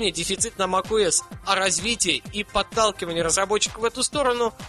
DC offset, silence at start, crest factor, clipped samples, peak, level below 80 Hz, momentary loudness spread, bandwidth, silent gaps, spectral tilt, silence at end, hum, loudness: under 0.1%; 0 s; 20 dB; under 0.1%; -2 dBFS; -46 dBFS; 4 LU; 13 kHz; none; -2 dB/octave; 0 s; none; -22 LUFS